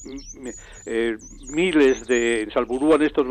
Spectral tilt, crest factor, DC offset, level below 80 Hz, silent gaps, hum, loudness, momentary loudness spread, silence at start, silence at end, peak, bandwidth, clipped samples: -4 dB/octave; 14 dB; under 0.1%; -46 dBFS; none; none; -21 LUFS; 18 LU; 0 s; 0 s; -8 dBFS; 9.6 kHz; under 0.1%